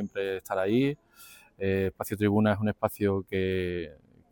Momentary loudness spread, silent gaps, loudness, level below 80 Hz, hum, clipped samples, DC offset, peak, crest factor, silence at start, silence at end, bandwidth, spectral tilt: 9 LU; none; -29 LUFS; -62 dBFS; none; under 0.1%; under 0.1%; -10 dBFS; 18 dB; 0 s; 0.4 s; 18 kHz; -7 dB/octave